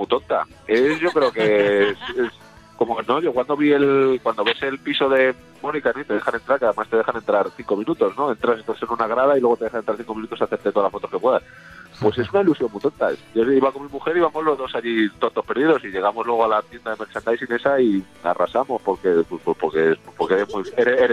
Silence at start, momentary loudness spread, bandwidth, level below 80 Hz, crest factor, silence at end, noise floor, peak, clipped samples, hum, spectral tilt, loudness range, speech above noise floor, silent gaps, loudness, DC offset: 0 s; 7 LU; 10.5 kHz; -56 dBFS; 16 dB; 0 s; -40 dBFS; -4 dBFS; under 0.1%; none; -6.5 dB/octave; 2 LU; 20 dB; none; -21 LUFS; under 0.1%